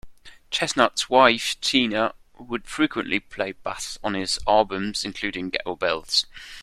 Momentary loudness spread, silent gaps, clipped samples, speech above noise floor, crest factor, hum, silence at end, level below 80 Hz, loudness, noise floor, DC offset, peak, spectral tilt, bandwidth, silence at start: 12 LU; none; under 0.1%; 20 dB; 22 dB; none; 0 s; -50 dBFS; -23 LUFS; -43 dBFS; under 0.1%; -2 dBFS; -2.5 dB/octave; 14 kHz; 0.05 s